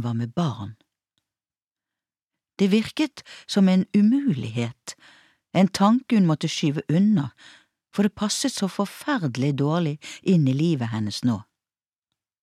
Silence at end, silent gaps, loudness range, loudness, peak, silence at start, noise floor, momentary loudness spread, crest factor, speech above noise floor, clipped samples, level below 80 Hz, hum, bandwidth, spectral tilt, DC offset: 1 s; 1.67-1.75 s; 4 LU; -23 LUFS; -8 dBFS; 0 s; under -90 dBFS; 10 LU; 16 dB; over 68 dB; under 0.1%; -66 dBFS; none; 14 kHz; -6 dB/octave; under 0.1%